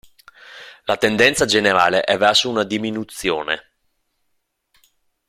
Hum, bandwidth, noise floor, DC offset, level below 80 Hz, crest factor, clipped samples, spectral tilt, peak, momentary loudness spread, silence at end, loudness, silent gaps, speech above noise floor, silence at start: none; 15.5 kHz; -72 dBFS; under 0.1%; -54 dBFS; 18 dB; under 0.1%; -3 dB/octave; -2 dBFS; 12 LU; 1.7 s; -17 LUFS; none; 54 dB; 0.5 s